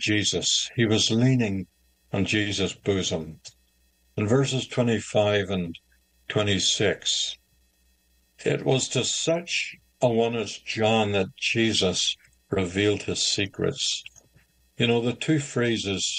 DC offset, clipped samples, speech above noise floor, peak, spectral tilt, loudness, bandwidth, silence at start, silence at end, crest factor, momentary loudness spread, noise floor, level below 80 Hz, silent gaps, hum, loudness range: under 0.1%; under 0.1%; 40 dB; -8 dBFS; -4 dB/octave; -24 LUFS; 10 kHz; 0 s; 0 s; 18 dB; 9 LU; -65 dBFS; -60 dBFS; none; none; 3 LU